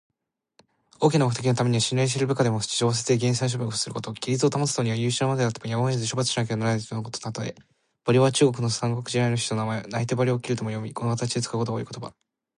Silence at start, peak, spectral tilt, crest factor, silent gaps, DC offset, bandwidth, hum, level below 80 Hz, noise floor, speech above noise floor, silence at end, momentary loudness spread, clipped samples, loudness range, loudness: 1 s; -8 dBFS; -5 dB/octave; 18 dB; none; under 0.1%; 11.5 kHz; none; -62 dBFS; -64 dBFS; 40 dB; 0.45 s; 10 LU; under 0.1%; 3 LU; -25 LUFS